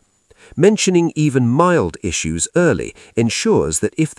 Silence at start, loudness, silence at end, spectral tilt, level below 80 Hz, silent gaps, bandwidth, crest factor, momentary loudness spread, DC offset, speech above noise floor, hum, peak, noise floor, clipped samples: 0.55 s; -16 LUFS; 0.05 s; -5 dB/octave; -44 dBFS; none; 12 kHz; 16 dB; 7 LU; under 0.1%; 34 dB; none; 0 dBFS; -50 dBFS; under 0.1%